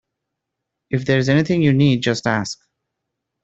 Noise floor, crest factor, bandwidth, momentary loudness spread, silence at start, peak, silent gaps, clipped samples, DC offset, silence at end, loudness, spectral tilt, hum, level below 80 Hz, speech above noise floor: -80 dBFS; 18 dB; 8 kHz; 11 LU; 0.9 s; -2 dBFS; none; under 0.1%; under 0.1%; 0.9 s; -18 LUFS; -6 dB/octave; none; -54 dBFS; 63 dB